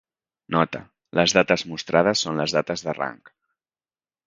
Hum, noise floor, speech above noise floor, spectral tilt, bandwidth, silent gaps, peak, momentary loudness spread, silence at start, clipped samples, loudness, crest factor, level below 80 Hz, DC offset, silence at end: none; under -90 dBFS; over 68 dB; -4 dB/octave; 9.6 kHz; none; 0 dBFS; 10 LU; 0.5 s; under 0.1%; -22 LUFS; 24 dB; -58 dBFS; under 0.1%; 1.1 s